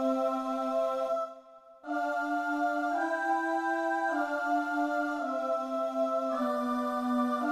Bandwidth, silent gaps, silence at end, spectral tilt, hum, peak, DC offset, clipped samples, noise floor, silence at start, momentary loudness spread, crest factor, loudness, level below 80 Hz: 15 kHz; none; 0 s; -4 dB/octave; none; -18 dBFS; under 0.1%; under 0.1%; -53 dBFS; 0 s; 3 LU; 12 dB; -31 LUFS; -74 dBFS